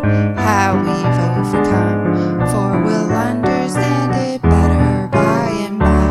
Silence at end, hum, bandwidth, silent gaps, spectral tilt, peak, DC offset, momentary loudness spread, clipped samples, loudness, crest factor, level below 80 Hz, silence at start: 0 s; none; 14 kHz; none; -7 dB/octave; 0 dBFS; under 0.1%; 3 LU; under 0.1%; -15 LUFS; 14 dB; -28 dBFS; 0 s